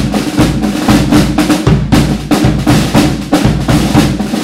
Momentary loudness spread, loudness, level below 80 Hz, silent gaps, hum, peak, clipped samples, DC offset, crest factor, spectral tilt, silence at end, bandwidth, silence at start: 3 LU; -10 LUFS; -22 dBFS; none; none; 0 dBFS; 0.4%; under 0.1%; 10 dB; -6 dB/octave; 0 s; 16.5 kHz; 0 s